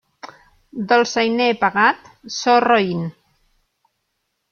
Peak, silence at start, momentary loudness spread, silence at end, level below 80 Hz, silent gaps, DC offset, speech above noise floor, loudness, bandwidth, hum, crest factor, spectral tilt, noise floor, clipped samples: -2 dBFS; 0.25 s; 16 LU; 1.4 s; -62 dBFS; none; under 0.1%; 56 dB; -17 LUFS; 7 kHz; none; 18 dB; -4.5 dB/octave; -73 dBFS; under 0.1%